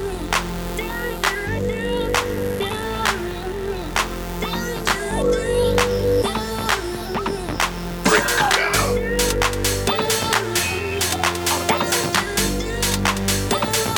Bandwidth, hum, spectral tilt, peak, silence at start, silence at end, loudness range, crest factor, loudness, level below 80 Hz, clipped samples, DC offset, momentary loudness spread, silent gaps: over 20 kHz; none; -3 dB/octave; -2 dBFS; 0 s; 0 s; 4 LU; 20 dB; -21 LUFS; -32 dBFS; under 0.1%; under 0.1%; 8 LU; none